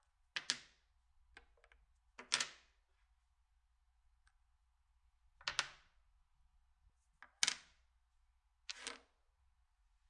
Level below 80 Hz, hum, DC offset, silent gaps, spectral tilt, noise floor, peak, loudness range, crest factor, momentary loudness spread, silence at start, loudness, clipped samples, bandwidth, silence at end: -76 dBFS; none; under 0.1%; none; 1.5 dB/octave; -78 dBFS; -14 dBFS; 5 LU; 36 dB; 19 LU; 0.35 s; -42 LUFS; under 0.1%; 11 kHz; 1.1 s